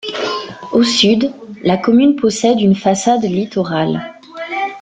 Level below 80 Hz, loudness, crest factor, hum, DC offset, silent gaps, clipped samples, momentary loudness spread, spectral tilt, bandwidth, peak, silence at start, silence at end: -54 dBFS; -15 LUFS; 14 dB; none; under 0.1%; none; under 0.1%; 12 LU; -5 dB/octave; 9.4 kHz; 0 dBFS; 0.05 s; 0 s